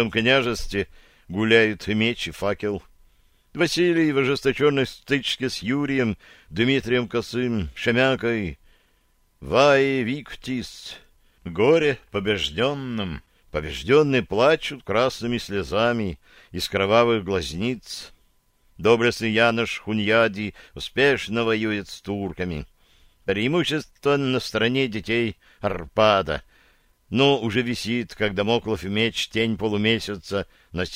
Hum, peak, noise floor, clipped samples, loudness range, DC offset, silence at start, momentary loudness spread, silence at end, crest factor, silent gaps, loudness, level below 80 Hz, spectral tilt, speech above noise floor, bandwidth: none; -4 dBFS; -63 dBFS; under 0.1%; 2 LU; under 0.1%; 0 s; 13 LU; 0 s; 20 dB; none; -22 LUFS; -46 dBFS; -5 dB/octave; 40 dB; 16 kHz